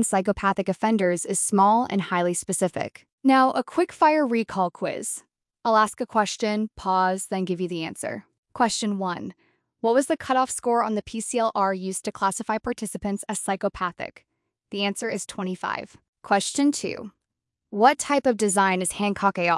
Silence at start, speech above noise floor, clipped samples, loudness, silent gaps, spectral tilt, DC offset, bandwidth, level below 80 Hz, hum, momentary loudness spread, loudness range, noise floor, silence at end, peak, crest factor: 0 s; 60 dB; under 0.1%; -24 LUFS; 3.12-3.18 s, 8.38-8.43 s, 16.08-16.13 s; -4 dB/octave; under 0.1%; 12 kHz; -58 dBFS; none; 11 LU; 6 LU; -84 dBFS; 0 s; -4 dBFS; 20 dB